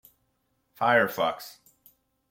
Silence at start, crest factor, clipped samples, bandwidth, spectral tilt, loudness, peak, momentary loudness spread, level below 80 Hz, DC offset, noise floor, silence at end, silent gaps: 0.8 s; 22 dB; under 0.1%; 17 kHz; -4.5 dB/octave; -25 LUFS; -8 dBFS; 18 LU; -72 dBFS; under 0.1%; -74 dBFS; 0.8 s; none